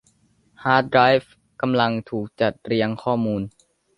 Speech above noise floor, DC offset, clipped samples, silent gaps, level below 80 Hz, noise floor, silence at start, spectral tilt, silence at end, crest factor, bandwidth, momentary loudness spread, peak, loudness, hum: 41 dB; under 0.1%; under 0.1%; none; -56 dBFS; -61 dBFS; 0.6 s; -7.5 dB/octave; 0.5 s; 20 dB; 11 kHz; 12 LU; -2 dBFS; -21 LUFS; none